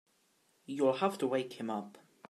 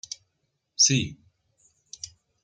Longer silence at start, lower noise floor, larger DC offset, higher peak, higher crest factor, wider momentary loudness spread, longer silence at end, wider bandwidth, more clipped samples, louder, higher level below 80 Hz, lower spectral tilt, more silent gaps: about the same, 0.7 s vs 0.8 s; second, -73 dBFS vs -77 dBFS; neither; second, -16 dBFS vs -8 dBFS; about the same, 20 dB vs 22 dB; second, 13 LU vs 22 LU; about the same, 0.3 s vs 0.4 s; first, 14 kHz vs 11 kHz; neither; second, -34 LUFS vs -22 LUFS; second, -88 dBFS vs -62 dBFS; first, -5.5 dB/octave vs -2 dB/octave; neither